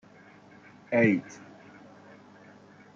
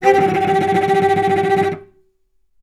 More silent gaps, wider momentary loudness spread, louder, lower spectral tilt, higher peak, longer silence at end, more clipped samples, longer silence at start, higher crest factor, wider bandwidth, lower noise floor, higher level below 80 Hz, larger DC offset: neither; first, 28 LU vs 5 LU; second, -26 LUFS vs -16 LUFS; first, -7.5 dB/octave vs -6 dB/octave; second, -10 dBFS vs 0 dBFS; first, 1.6 s vs 0.8 s; neither; first, 0.9 s vs 0 s; first, 24 dB vs 16 dB; second, 7.4 kHz vs 12.5 kHz; second, -54 dBFS vs -62 dBFS; second, -74 dBFS vs -56 dBFS; neither